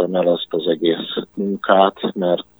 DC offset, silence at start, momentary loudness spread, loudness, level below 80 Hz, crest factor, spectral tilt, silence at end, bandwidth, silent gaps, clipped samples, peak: under 0.1%; 0 s; 9 LU; -19 LUFS; -64 dBFS; 18 dB; -8 dB/octave; 0.15 s; over 20 kHz; none; under 0.1%; 0 dBFS